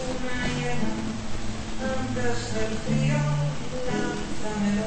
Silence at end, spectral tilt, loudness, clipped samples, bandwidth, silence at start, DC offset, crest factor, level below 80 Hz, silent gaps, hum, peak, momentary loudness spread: 0 s; -5.5 dB/octave; -28 LUFS; under 0.1%; 8.8 kHz; 0 s; under 0.1%; 12 dB; -38 dBFS; none; none; -12 dBFS; 8 LU